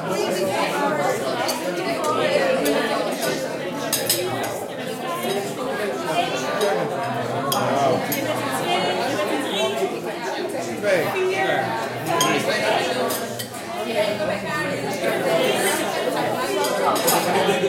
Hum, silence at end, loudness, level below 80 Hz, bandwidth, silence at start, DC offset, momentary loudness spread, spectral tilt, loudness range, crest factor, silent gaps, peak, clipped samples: none; 0 s; -22 LUFS; -66 dBFS; 16.5 kHz; 0 s; under 0.1%; 7 LU; -3.5 dB/octave; 2 LU; 18 dB; none; -4 dBFS; under 0.1%